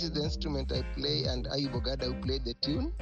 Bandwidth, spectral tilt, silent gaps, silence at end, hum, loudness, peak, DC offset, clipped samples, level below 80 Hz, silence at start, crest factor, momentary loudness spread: 8 kHz; -6 dB/octave; none; 0 s; none; -33 LUFS; -16 dBFS; under 0.1%; under 0.1%; -38 dBFS; 0 s; 16 dB; 3 LU